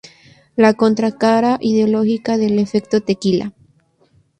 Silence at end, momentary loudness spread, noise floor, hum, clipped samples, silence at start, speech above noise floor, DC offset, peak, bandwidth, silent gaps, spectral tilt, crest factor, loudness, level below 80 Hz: 0.9 s; 5 LU; -56 dBFS; none; under 0.1%; 0.55 s; 41 dB; under 0.1%; -2 dBFS; 9.2 kHz; none; -6.5 dB/octave; 16 dB; -16 LUFS; -56 dBFS